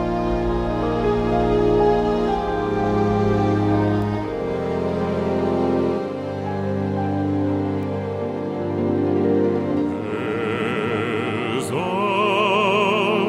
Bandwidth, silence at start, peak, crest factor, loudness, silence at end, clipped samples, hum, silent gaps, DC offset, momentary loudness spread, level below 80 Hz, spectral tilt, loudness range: 12.5 kHz; 0 s; -6 dBFS; 16 dB; -21 LUFS; 0 s; under 0.1%; none; none; under 0.1%; 7 LU; -38 dBFS; -7 dB/octave; 3 LU